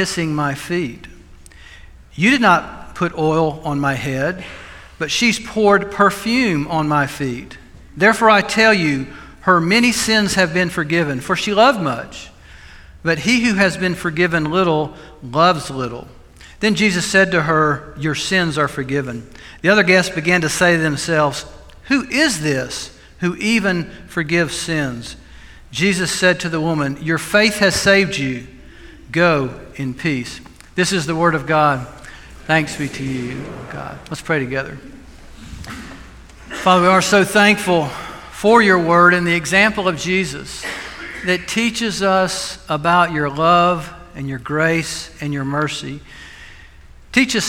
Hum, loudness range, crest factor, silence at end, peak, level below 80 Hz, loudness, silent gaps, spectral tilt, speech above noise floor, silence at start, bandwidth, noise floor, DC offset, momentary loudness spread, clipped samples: none; 6 LU; 18 dB; 0 s; 0 dBFS; -44 dBFS; -16 LUFS; none; -4.5 dB/octave; 24 dB; 0 s; 17.5 kHz; -41 dBFS; under 0.1%; 17 LU; under 0.1%